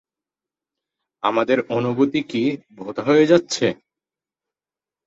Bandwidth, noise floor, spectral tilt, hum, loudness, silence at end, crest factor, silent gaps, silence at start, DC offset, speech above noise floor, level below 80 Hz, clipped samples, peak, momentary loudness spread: 8 kHz; under -90 dBFS; -5.5 dB/octave; none; -20 LUFS; 1.3 s; 20 dB; none; 1.25 s; under 0.1%; over 71 dB; -64 dBFS; under 0.1%; -2 dBFS; 12 LU